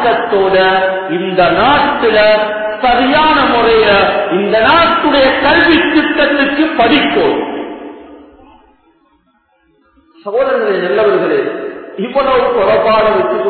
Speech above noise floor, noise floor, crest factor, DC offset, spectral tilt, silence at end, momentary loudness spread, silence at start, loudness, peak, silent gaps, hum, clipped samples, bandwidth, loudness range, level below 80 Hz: 45 dB; -56 dBFS; 12 dB; under 0.1%; -8 dB/octave; 0 s; 9 LU; 0 s; -10 LUFS; 0 dBFS; none; none; under 0.1%; 4.6 kHz; 9 LU; -40 dBFS